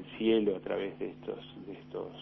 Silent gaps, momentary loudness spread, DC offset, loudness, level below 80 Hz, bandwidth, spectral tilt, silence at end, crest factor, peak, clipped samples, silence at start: none; 16 LU; under 0.1%; -34 LUFS; -66 dBFS; 5.6 kHz; -9 dB/octave; 0 s; 18 dB; -16 dBFS; under 0.1%; 0 s